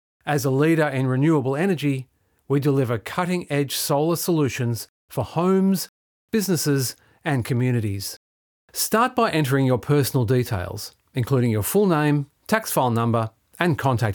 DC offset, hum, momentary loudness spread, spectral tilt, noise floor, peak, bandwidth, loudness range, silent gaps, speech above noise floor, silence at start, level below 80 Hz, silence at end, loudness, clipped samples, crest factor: under 0.1%; none; 10 LU; -5.5 dB/octave; under -90 dBFS; -2 dBFS; 19.5 kHz; 2 LU; 4.89-5.08 s, 5.89-6.28 s, 8.17-8.68 s; over 69 dB; 0.25 s; -60 dBFS; 0 s; -22 LUFS; under 0.1%; 20 dB